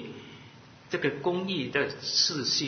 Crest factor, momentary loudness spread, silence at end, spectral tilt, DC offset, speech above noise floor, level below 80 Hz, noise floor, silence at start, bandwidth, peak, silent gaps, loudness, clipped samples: 20 dB; 19 LU; 0 s; -3 dB/octave; under 0.1%; 22 dB; -68 dBFS; -51 dBFS; 0 s; 6.6 kHz; -10 dBFS; none; -28 LUFS; under 0.1%